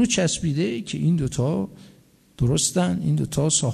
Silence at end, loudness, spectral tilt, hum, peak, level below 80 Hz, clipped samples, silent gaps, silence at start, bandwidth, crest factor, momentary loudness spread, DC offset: 0 s; -23 LUFS; -4.5 dB/octave; none; -6 dBFS; -46 dBFS; under 0.1%; none; 0 s; 13.5 kHz; 16 dB; 6 LU; under 0.1%